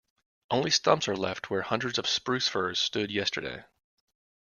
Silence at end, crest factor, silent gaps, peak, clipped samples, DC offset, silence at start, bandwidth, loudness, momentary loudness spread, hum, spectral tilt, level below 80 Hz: 0.9 s; 24 dB; none; -8 dBFS; under 0.1%; under 0.1%; 0.5 s; 10 kHz; -28 LUFS; 8 LU; none; -3 dB/octave; -66 dBFS